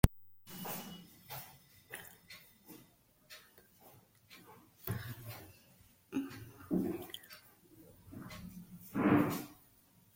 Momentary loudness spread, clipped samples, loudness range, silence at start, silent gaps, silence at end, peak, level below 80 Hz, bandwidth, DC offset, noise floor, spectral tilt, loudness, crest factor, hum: 26 LU; under 0.1%; 15 LU; 0.05 s; none; 0.6 s; -10 dBFS; -50 dBFS; 16.5 kHz; under 0.1%; -67 dBFS; -6 dB/octave; -39 LUFS; 32 dB; none